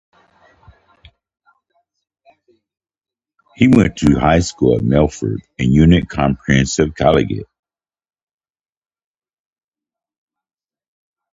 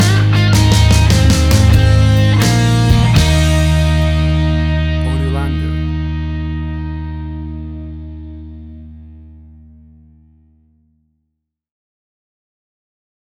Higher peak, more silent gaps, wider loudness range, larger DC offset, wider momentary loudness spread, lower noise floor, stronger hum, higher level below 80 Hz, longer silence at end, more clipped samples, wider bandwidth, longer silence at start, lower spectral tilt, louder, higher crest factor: about the same, 0 dBFS vs -2 dBFS; neither; second, 7 LU vs 20 LU; neither; second, 9 LU vs 19 LU; first, -88 dBFS vs -73 dBFS; neither; second, -34 dBFS vs -20 dBFS; about the same, 3.9 s vs 4 s; neither; second, 10 kHz vs 16.5 kHz; first, 3.6 s vs 0 s; about the same, -6.5 dB/octave vs -5.5 dB/octave; about the same, -15 LUFS vs -13 LUFS; first, 18 dB vs 12 dB